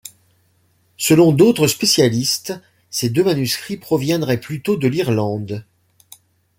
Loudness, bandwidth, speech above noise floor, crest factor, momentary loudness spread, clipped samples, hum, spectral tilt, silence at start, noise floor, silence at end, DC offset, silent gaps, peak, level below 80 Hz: -17 LUFS; 16.5 kHz; 43 dB; 16 dB; 13 LU; under 0.1%; none; -5 dB/octave; 0.05 s; -60 dBFS; 0.95 s; under 0.1%; none; -2 dBFS; -56 dBFS